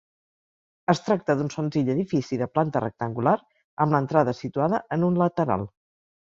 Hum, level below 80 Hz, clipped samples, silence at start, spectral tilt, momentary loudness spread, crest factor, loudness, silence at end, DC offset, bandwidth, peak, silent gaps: none; -60 dBFS; under 0.1%; 0.9 s; -7.5 dB/octave; 5 LU; 20 dB; -25 LUFS; 0.5 s; under 0.1%; 7.6 kHz; -4 dBFS; 3.64-3.77 s